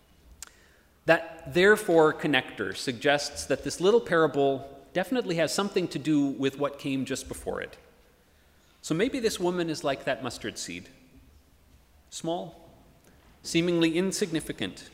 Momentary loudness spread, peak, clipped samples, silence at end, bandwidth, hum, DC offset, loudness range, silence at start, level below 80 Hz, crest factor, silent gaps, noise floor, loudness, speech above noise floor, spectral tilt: 14 LU; -6 dBFS; under 0.1%; 0.05 s; 16 kHz; none; under 0.1%; 9 LU; 1.05 s; -58 dBFS; 22 dB; none; -61 dBFS; -27 LUFS; 34 dB; -4.5 dB/octave